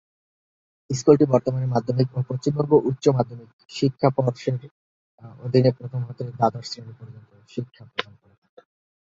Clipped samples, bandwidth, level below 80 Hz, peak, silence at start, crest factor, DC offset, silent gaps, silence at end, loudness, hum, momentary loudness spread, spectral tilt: under 0.1%; 7.8 kHz; -60 dBFS; -2 dBFS; 0.9 s; 22 dB; under 0.1%; 3.53-3.59 s, 4.71-5.18 s; 1 s; -22 LUFS; none; 18 LU; -7 dB/octave